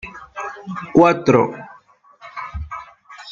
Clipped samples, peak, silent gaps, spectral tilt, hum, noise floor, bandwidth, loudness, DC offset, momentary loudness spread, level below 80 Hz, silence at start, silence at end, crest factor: under 0.1%; 0 dBFS; none; -7 dB/octave; none; -50 dBFS; 7.4 kHz; -17 LUFS; under 0.1%; 22 LU; -42 dBFS; 0.05 s; 0 s; 20 dB